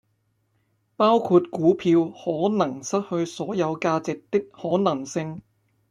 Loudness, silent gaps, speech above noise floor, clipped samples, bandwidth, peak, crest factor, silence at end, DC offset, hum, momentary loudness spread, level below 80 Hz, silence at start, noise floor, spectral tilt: -23 LUFS; none; 47 dB; under 0.1%; 10.5 kHz; -6 dBFS; 18 dB; 0.5 s; under 0.1%; none; 9 LU; -66 dBFS; 1 s; -70 dBFS; -6 dB/octave